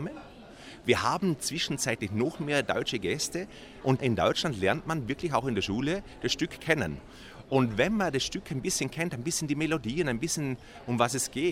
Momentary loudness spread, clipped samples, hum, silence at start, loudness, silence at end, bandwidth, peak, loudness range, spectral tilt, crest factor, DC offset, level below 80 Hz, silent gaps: 9 LU; under 0.1%; none; 0 s; -29 LUFS; 0 s; 16 kHz; -8 dBFS; 1 LU; -4 dB/octave; 22 dB; under 0.1%; -54 dBFS; none